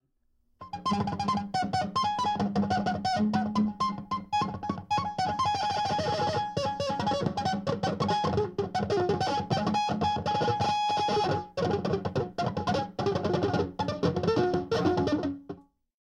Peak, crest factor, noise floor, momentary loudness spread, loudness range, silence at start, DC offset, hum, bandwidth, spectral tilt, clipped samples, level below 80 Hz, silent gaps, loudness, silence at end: -14 dBFS; 16 dB; -71 dBFS; 4 LU; 1 LU; 0.6 s; under 0.1%; none; 10.5 kHz; -6 dB/octave; under 0.1%; -58 dBFS; none; -29 LUFS; 0.4 s